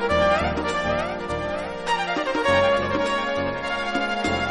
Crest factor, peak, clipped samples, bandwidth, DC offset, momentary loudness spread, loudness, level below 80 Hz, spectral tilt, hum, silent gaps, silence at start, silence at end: 18 dB; -6 dBFS; under 0.1%; 11.5 kHz; under 0.1%; 8 LU; -23 LUFS; -42 dBFS; -5 dB/octave; none; none; 0 s; 0 s